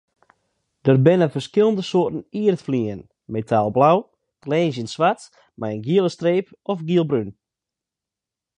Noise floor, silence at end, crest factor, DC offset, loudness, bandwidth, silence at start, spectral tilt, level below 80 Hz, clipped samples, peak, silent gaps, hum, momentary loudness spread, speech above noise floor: -87 dBFS; 1.3 s; 20 dB; under 0.1%; -20 LUFS; 10.5 kHz; 0.85 s; -7.5 dB/octave; -60 dBFS; under 0.1%; -2 dBFS; none; none; 13 LU; 67 dB